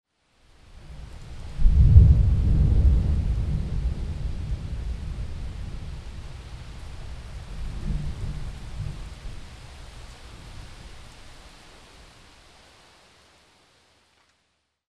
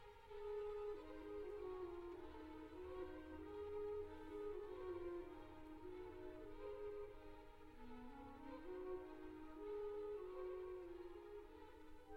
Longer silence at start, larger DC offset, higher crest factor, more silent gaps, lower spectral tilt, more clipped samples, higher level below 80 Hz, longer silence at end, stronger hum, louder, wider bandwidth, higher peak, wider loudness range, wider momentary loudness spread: first, 0.7 s vs 0 s; neither; first, 24 dB vs 12 dB; neither; about the same, -8 dB/octave vs -7 dB/octave; neither; first, -26 dBFS vs -64 dBFS; first, 3.45 s vs 0 s; neither; first, -24 LUFS vs -53 LUFS; second, 9.6 kHz vs 16 kHz; first, 0 dBFS vs -40 dBFS; first, 24 LU vs 3 LU; first, 24 LU vs 10 LU